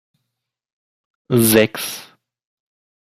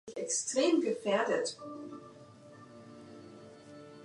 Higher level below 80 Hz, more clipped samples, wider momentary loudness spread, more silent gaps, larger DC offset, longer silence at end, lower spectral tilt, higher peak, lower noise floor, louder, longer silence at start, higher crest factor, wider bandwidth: first, -56 dBFS vs -80 dBFS; neither; second, 15 LU vs 24 LU; neither; neither; first, 1 s vs 0 s; first, -4.5 dB/octave vs -3 dB/octave; first, 0 dBFS vs -18 dBFS; first, -80 dBFS vs -54 dBFS; first, -16 LUFS vs -31 LUFS; first, 1.3 s vs 0.05 s; about the same, 20 dB vs 18 dB; first, 15.5 kHz vs 11.5 kHz